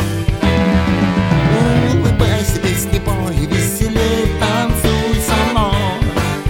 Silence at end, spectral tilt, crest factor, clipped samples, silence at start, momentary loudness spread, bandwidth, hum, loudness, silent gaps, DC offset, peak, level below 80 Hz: 0 s; -5.5 dB/octave; 14 dB; under 0.1%; 0 s; 4 LU; 17 kHz; none; -15 LUFS; none; 0.1%; 0 dBFS; -22 dBFS